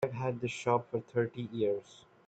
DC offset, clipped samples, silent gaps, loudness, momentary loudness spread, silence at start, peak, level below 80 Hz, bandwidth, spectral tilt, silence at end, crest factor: under 0.1%; under 0.1%; none; -34 LUFS; 4 LU; 0 s; -14 dBFS; -72 dBFS; 9 kHz; -6.5 dB/octave; 0.3 s; 20 dB